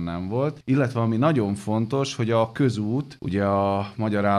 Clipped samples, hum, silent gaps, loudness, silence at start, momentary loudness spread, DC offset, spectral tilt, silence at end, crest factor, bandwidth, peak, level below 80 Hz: under 0.1%; none; none; -24 LUFS; 0 s; 5 LU; under 0.1%; -7 dB/octave; 0 s; 16 dB; 12 kHz; -8 dBFS; -56 dBFS